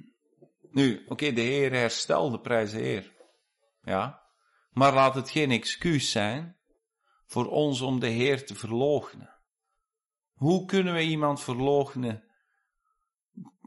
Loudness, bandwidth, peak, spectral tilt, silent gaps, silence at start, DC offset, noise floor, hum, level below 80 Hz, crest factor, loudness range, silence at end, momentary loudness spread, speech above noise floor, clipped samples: -27 LUFS; 11.5 kHz; -10 dBFS; -5 dB/octave; none; 0.75 s; under 0.1%; under -90 dBFS; none; -62 dBFS; 18 dB; 3 LU; 0.2 s; 10 LU; over 64 dB; under 0.1%